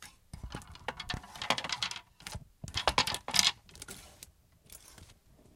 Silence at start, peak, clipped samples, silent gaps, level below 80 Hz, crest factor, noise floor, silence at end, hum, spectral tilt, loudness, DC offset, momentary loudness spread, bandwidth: 0 s; -4 dBFS; under 0.1%; none; -54 dBFS; 34 dB; -60 dBFS; 0.4 s; none; -1 dB/octave; -32 LUFS; under 0.1%; 25 LU; 16.5 kHz